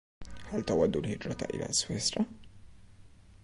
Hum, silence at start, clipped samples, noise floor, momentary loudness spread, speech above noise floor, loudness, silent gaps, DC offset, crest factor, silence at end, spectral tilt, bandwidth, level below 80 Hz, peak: none; 0.2 s; under 0.1%; -54 dBFS; 10 LU; 23 dB; -32 LUFS; none; under 0.1%; 18 dB; 0.05 s; -4 dB/octave; 11.5 kHz; -54 dBFS; -16 dBFS